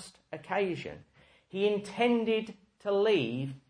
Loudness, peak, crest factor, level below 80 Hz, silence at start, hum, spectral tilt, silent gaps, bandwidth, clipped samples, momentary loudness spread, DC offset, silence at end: -30 LUFS; -14 dBFS; 16 dB; -70 dBFS; 0 s; none; -6 dB/octave; none; 10.5 kHz; under 0.1%; 18 LU; under 0.1%; 0.1 s